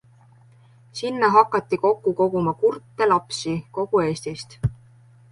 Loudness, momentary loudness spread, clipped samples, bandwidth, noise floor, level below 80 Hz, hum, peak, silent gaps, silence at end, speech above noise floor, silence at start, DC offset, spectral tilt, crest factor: -22 LUFS; 11 LU; under 0.1%; 11.5 kHz; -52 dBFS; -50 dBFS; none; -2 dBFS; none; 0.6 s; 31 dB; 0.95 s; under 0.1%; -6 dB/octave; 20 dB